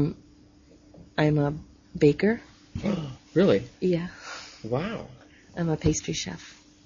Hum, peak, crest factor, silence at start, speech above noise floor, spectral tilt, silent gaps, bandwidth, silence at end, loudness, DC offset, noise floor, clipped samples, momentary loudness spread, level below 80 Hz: none; -8 dBFS; 20 dB; 0 s; 29 dB; -6 dB/octave; none; 7.6 kHz; 0.35 s; -27 LUFS; under 0.1%; -55 dBFS; under 0.1%; 19 LU; -50 dBFS